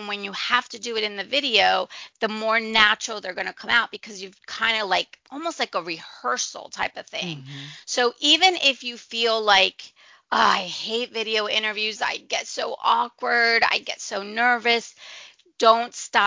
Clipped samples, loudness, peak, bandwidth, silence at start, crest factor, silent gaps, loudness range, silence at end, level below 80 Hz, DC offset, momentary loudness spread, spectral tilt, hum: under 0.1%; -22 LUFS; 0 dBFS; 7.6 kHz; 0 s; 22 dB; none; 6 LU; 0 s; -66 dBFS; under 0.1%; 14 LU; -1.5 dB/octave; none